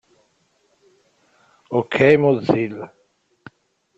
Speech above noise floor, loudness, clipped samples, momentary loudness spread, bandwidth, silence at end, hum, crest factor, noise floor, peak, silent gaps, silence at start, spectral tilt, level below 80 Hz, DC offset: 47 dB; -18 LUFS; under 0.1%; 18 LU; 7.8 kHz; 1.1 s; none; 20 dB; -64 dBFS; -2 dBFS; none; 1.7 s; -7.5 dB/octave; -58 dBFS; under 0.1%